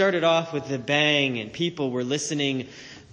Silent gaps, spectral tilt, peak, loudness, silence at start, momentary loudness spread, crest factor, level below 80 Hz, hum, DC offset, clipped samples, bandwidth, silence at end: none; -4 dB/octave; -8 dBFS; -24 LUFS; 0 s; 10 LU; 18 dB; -66 dBFS; none; under 0.1%; under 0.1%; 10.5 kHz; 0.1 s